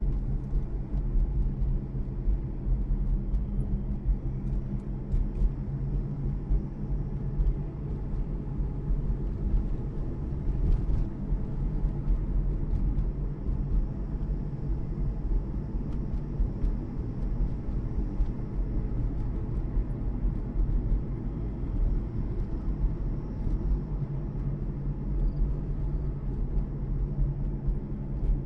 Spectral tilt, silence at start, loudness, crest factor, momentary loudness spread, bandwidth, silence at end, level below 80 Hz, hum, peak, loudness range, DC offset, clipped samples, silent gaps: -11 dB/octave; 0 s; -33 LUFS; 14 dB; 3 LU; 2.5 kHz; 0 s; -30 dBFS; none; -14 dBFS; 1 LU; under 0.1%; under 0.1%; none